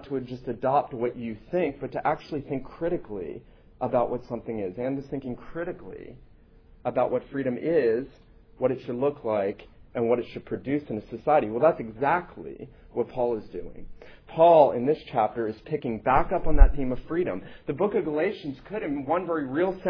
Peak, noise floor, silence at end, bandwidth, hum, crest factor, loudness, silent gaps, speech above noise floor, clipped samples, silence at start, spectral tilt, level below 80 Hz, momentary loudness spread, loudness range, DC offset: -2 dBFS; -53 dBFS; 0 s; 5.4 kHz; none; 24 dB; -27 LUFS; none; 28 dB; under 0.1%; 0 s; -9.5 dB/octave; -34 dBFS; 13 LU; 8 LU; under 0.1%